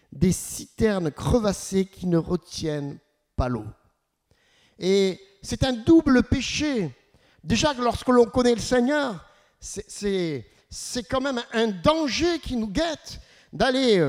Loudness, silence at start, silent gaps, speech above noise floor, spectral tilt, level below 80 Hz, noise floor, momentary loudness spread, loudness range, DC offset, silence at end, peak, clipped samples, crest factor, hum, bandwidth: -24 LUFS; 0.1 s; none; 45 dB; -5 dB/octave; -42 dBFS; -68 dBFS; 16 LU; 6 LU; under 0.1%; 0 s; -6 dBFS; under 0.1%; 18 dB; none; 16 kHz